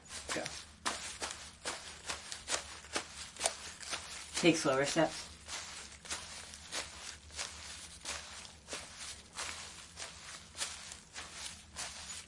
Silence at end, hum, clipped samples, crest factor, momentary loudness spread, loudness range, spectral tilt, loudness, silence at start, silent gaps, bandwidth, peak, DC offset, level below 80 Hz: 0 s; none; under 0.1%; 28 dB; 15 LU; 9 LU; -2.5 dB/octave; -39 LUFS; 0 s; none; 11.5 kHz; -12 dBFS; under 0.1%; -64 dBFS